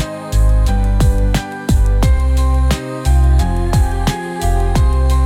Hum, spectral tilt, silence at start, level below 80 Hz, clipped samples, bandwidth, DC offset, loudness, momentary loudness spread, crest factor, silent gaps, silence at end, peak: none; -6 dB/octave; 0 s; -14 dBFS; under 0.1%; 15 kHz; under 0.1%; -15 LUFS; 5 LU; 10 dB; none; 0 s; -2 dBFS